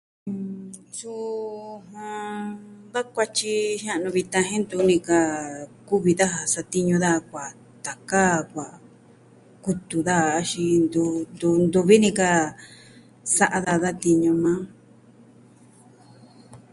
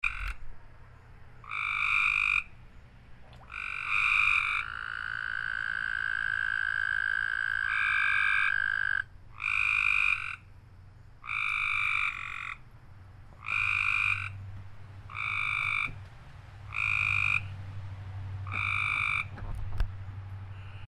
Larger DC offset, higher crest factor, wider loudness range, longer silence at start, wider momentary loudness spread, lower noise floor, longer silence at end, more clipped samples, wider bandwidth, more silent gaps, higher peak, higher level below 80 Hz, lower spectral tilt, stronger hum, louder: neither; about the same, 20 dB vs 18 dB; about the same, 6 LU vs 4 LU; first, 0.25 s vs 0.05 s; second, 16 LU vs 19 LU; about the same, -52 dBFS vs -51 dBFS; first, 0.15 s vs 0 s; neither; about the same, 11.5 kHz vs 11.5 kHz; neither; first, -4 dBFS vs -14 dBFS; second, -60 dBFS vs -48 dBFS; first, -4.5 dB/octave vs -3 dB/octave; neither; first, -22 LUFS vs -28 LUFS